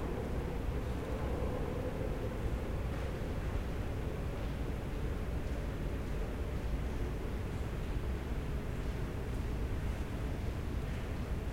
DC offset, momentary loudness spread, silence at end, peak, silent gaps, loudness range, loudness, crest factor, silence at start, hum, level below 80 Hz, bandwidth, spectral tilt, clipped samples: 0.2%; 2 LU; 0 s; -24 dBFS; none; 1 LU; -39 LUFS; 14 dB; 0 s; none; -40 dBFS; 16 kHz; -7 dB/octave; under 0.1%